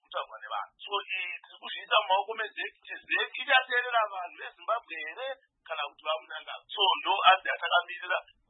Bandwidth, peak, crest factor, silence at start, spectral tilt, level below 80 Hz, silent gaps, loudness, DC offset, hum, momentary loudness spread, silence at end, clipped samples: 4.1 kHz; -6 dBFS; 24 dB; 0.1 s; -3 dB/octave; -86 dBFS; none; -29 LUFS; under 0.1%; none; 15 LU; 0.25 s; under 0.1%